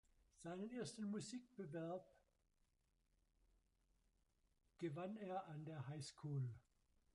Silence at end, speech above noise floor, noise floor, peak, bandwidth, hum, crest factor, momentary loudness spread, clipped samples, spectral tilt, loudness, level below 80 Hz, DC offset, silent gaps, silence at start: 0.55 s; 34 dB; -84 dBFS; -36 dBFS; 11 kHz; none; 16 dB; 6 LU; under 0.1%; -6 dB/octave; -51 LUFS; -82 dBFS; under 0.1%; none; 0.4 s